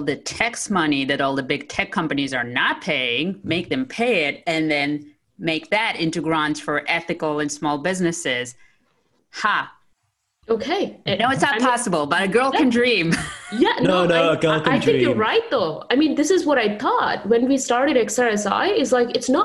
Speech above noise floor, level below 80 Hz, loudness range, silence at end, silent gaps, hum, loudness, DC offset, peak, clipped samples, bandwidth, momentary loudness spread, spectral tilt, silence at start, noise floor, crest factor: 52 dB; -56 dBFS; 6 LU; 0 s; none; none; -20 LUFS; under 0.1%; -2 dBFS; under 0.1%; 12.5 kHz; 7 LU; -4 dB/octave; 0 s; -72 dBFS; 18 dB